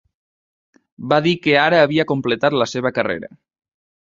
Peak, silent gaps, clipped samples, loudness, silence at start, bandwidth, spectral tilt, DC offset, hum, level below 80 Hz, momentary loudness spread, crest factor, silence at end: -2 dBFS; none; under 0.1%; -17 LUFS; 1 s; 7.6 kHz; -5.5 dB/octave; under 0.1%; none; -58 dBFS; 9 LU; 18 dB; 0.85 s